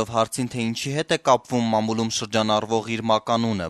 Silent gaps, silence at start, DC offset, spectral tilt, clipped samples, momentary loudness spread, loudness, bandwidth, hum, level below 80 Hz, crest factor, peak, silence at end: none; 0 s; under 0.1%; -4.5 dB/octave; under 0.1%; 5 LU; -23 LUFS; 13.5 kHz; none; -58 dBFS; 20 dB; -2 dBFS; 0 s